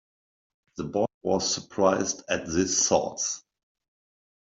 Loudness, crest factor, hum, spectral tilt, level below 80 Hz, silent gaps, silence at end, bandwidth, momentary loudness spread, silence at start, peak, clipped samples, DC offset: -26 LUFS; 20 dB; none; -3 dB/octave; -60 dBFS; 1.14-1.21 s; 1 s; 7.8 kHz; 10 LU; 0.75 s; -8 dBFS; under 0.1%; under 0.1%